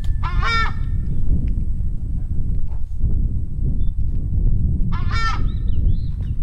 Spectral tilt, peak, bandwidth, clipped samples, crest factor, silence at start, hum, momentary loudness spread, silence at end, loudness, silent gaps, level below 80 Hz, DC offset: -6.5 dB/octave; -6 dBFS; 6.8 kHz; under 0.1%; 12 dB; 0 s; none; 6 LU; 0 s; -24 LUFS; none; -20 dBFS; under 0.1%